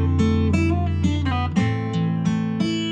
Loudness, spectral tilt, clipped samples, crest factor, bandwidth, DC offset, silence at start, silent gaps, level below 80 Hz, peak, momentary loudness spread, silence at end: -22 LUFS; -7 dB/octave; under 0.1%; 12 dB; 8.8 kHz; under 0.1%; 0 s; none; -34 dBFS; -8 dBFS; 3 LU; 0 s